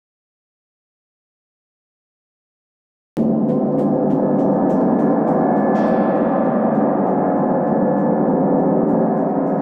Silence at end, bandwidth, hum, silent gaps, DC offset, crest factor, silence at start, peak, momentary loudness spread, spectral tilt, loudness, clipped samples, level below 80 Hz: 0 s; 3.8 kHz; none; none; under 0.1%; 12 dB; 3.15 s; -6 dBFS; 2 LU; -11 dB/octave; -17 LUFS; under 0.1%; -56 dBFS